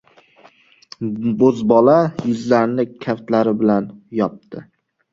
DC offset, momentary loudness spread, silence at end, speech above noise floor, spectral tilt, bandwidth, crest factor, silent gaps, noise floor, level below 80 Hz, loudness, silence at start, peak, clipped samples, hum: under 0.1%; 14 LU; 0.5 s; 34 dB; -8 dB/octave; 7.6 kHz; 18 dB; none; -51 dBFS; -58 dBFS; -17 LUFS; 1 s; 0 dBFS; under 0.1%; none